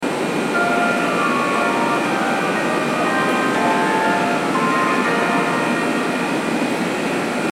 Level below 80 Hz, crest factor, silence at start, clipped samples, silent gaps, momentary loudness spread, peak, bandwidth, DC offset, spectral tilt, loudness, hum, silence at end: -64 dBFS; 14 dB; 0 s; under 0.1%; none; 3 LU; -6 dBFS; 16.5 kHz; under 0.1%; -4.5 dB/octave; -18 LUFS; none; 0 s